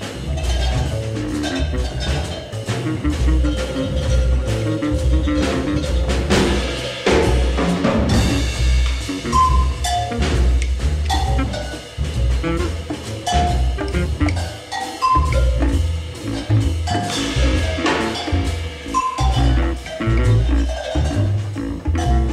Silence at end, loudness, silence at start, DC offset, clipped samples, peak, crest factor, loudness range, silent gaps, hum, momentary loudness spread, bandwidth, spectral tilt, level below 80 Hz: 0 s; -20 LUFS; 0 s; under 0.1%; under 0.1%; -4 dBFS; 14 dB; 3 LU; none; none; 8 LU; 12.5 kHz; -5.5 dB/octave; -22 dBFS